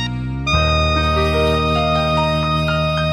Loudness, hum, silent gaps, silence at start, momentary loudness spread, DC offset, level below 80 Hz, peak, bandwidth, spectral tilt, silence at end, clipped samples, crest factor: -17 LUFS; none; none; 0 s; 2 LU; under 0.1%; -26 dBFS; -4 dBFS; 12.5 kHz; -6 dB/octave; 0 s; under 0.1%; 12 dB